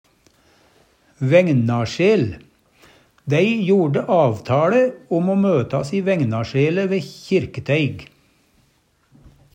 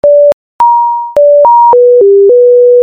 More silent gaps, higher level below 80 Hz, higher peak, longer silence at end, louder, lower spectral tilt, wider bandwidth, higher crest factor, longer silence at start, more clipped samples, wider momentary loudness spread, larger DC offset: second, none vs 0.33-0.59 s; second, -56 dBFS vs -50 dBFS; about the same, -2 dBFS vs 0 dBFS; first, 1.5 s vs 0 s; second, -19 LUFS vs -5 LUFS; about the same, -7.5 dB/octave vs -7 dB/octave; first, 9.6 kHz vs 4.1 kHz; first, 18 dB vs 4 dB; first, 1.2 s vs 0.05 s; neither; about the same, 8 LU vs 6 LU; neither